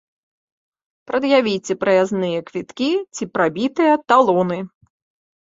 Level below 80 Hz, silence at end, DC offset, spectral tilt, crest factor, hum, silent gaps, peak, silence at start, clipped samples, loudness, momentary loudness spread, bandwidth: -64 dBFS; 0.75 s; under 0.1%; -5.5 dB/octave; 18 dB; none; none; -2 dBFS; 1.1 s; under 0.1%; -18 LUFS; 11 LU; 7.8 kHz